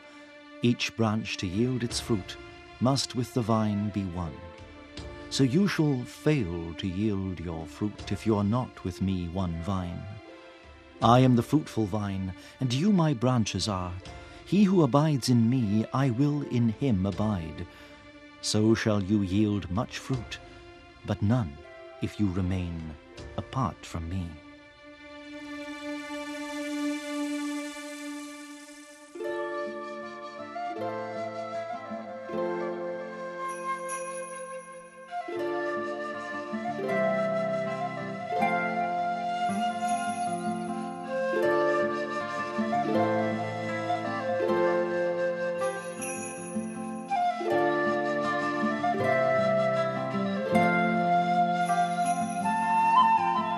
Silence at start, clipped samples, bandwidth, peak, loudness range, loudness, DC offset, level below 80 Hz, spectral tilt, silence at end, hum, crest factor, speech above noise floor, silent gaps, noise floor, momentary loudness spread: 0 s; under 0.1%; 14 kHz; -6 dBFS; 9 LU; -29 LUFS; under 0.1%; -54 dBFS; -6 dB/octave; 0 s; none; 22 dB; 23 dB; none; -50 dBFS; 16 LU